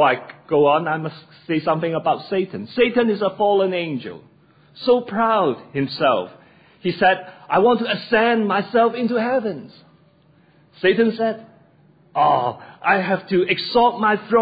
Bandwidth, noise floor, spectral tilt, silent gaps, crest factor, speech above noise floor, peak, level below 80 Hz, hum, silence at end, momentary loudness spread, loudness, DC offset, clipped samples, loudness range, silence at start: 5 kHz; -55 dBFS; -9 dB/octave; none; 16 dB; 36 dB; -4 dBFS; -62 dBFS; none; 0 s; 10 LU; -19 LUFS; under 0.1%; under 0.1%; 3 LU; 0 s